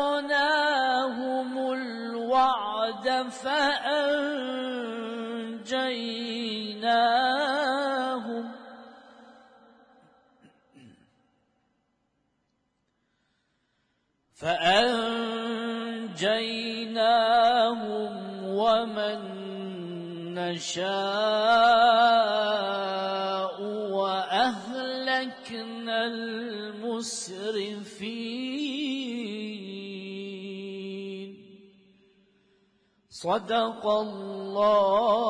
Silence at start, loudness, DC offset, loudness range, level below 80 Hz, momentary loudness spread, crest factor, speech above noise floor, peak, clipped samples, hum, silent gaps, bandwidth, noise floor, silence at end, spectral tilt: 0 s; -27 LUFS; under 0.1%; 11 LU; -70 dBFS; 15 LU; 20 dB; 50 dB; -8 dBFS; under 0.1%; none; none; 10.5 kHz; -75 dBFS; 0 s; -3.5 dB/octave